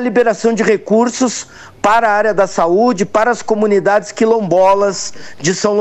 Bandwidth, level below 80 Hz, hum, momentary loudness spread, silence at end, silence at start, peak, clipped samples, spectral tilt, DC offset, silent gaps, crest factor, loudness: 9.6 kHz; -50 dBFS; none; 7 LU; 0 s; 0 s; 0 dBFS; under 0.1%; -4.5 dB/octave; under 0.1%; none; 14 dB; -13 LUFS